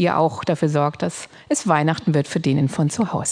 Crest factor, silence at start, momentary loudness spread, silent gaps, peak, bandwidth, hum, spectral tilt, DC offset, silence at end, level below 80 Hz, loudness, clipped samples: 18 dB; 0 s; 6 LU; none; -2 dBFS; 10 kHz; none; -5.5 dB/octave; under 0.1%; 0 s; -58 dBFS; -20 LUFS; under 0.1%